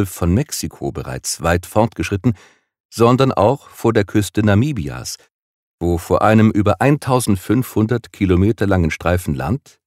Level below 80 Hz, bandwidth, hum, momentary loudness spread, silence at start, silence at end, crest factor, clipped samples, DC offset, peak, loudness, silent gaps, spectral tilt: -38 dBFS; 16 kHz; none; 11 LU; 0 s; 0.3 s; 16 dB; under 0.1%; under 0.1%; 0 dBFS; -17 LUFS; 2.80-2.89 s, 5.31-5.78 s; -6 dB/octave